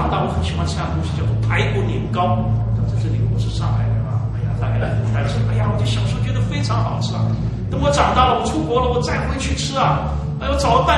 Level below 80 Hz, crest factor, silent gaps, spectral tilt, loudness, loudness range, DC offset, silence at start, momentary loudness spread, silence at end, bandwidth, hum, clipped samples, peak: -28 dBFS; 16 dB; none; -6 dB/octave; -19 LUFS; 2 LU; under 0.1%; 0 s; 5 LU; 0 s; 10.5 kHz; none; under 0.1%; -2 dBFS